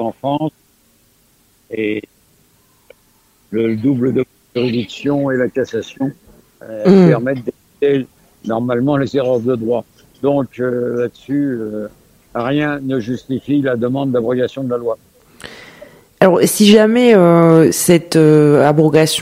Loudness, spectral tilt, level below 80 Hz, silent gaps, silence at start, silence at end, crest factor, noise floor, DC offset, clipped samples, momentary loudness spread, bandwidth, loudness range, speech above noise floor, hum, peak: -14 LUFS; -6 dB/octave; -54 dBFS; none; 0 s; 0 s; 14 dB; -55 dBFS; under 0.1%; 0.2%; 15 LU; 16 kHz; 10 LU; 41 dB; none; 0 dBFS